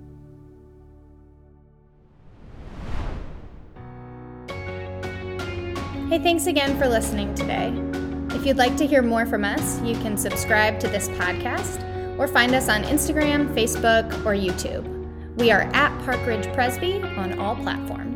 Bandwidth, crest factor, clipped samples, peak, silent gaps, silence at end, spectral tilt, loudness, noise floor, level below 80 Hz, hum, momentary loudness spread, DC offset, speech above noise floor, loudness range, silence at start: 19 kHz; 22 dB; under 0.1%; -2 dBFS; none; 0 s; -4.5 dB/octave; -23 LUFS; -53 dBFS; -38 dBFS; none; 15 LU; under 0.1%; 31 dB; 18 LU; 0 s